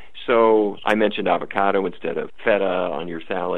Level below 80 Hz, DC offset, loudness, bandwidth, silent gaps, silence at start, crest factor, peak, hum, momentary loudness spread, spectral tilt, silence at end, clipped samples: -56 dBFS; 2%; -21 LUFS; 8.6 kHz; none; 0.15 s; 20 dB; -2 dBFS; none; 11 LU; -6.5 dB/octave; 0 s; under 0.1%